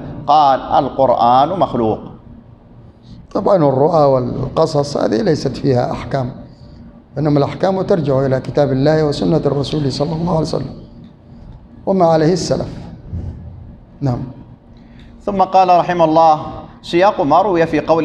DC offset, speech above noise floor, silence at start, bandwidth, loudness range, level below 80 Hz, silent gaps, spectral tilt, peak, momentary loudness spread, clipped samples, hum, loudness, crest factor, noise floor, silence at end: under 0.1%; 27 dB; 0 s; 10.5 kHz; 4 LU; -40 dBFS; none; -7 dB/octave; 0 dBFS; 16 LU; under 0.1%; none; -15 LUFS; 14 dB; -41 dBFS; 0 s